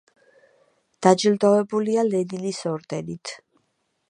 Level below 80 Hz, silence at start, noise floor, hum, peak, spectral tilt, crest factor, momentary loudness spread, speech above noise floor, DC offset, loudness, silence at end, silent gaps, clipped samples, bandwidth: -70 dBFS; 1 s; -72 dBFS; none; -2 dBFS; -5.5 dB/octave; 22 dB; 16 LU; 51 dB; under 0.1%; -22 LUFS; 0.75 s; none; under 0.1%; 10.5 kHz